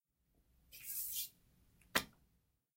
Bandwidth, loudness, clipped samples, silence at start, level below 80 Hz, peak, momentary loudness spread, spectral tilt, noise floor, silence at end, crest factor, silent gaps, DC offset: 16 kHz; -41 LUFS; under 0.1%; 0.7 s; -72 dBFS; -16 dBFS; 15 LU; -1 dB/octave; -80 dBFS; 0.65 s; 32 dB; none; under 0.1%